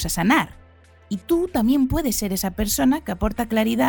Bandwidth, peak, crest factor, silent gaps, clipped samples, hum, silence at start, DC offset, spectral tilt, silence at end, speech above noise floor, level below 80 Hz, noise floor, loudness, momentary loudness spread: 19 kHz; -6 dBFS; 16 dB; none; under 0.1%; none; 0 s; under 0.1%; -4.5 dB/octave; 0 s; 29 dB; -36 dBFS; -50 dBFS; -21 LUFS; 7 LU